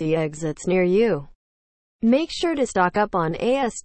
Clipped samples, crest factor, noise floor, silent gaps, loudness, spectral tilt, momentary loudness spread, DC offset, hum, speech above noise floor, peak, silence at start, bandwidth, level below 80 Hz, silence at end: under 0.1%; 16 dB; under -90 dBFS; 1.35-1.99 s; -22 LUFS; -5.5 dB/octave; 6 LU; under 0.1%; none; over 69 dB; -6 dBFS; 0 s; 8.8 kHz; -50 dBFS; 0.05 s